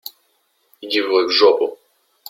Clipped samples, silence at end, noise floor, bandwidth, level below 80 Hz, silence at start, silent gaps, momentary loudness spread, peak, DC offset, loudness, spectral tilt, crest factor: under 0.1%; 0.55 s; -64 dBFS; 16.5 kHz; -66 dBFS; 0.8 s; none; 20 LU; -2 dBFS; under 0.1%; -16 LUFS; -2.5 dB/octave; 18 dB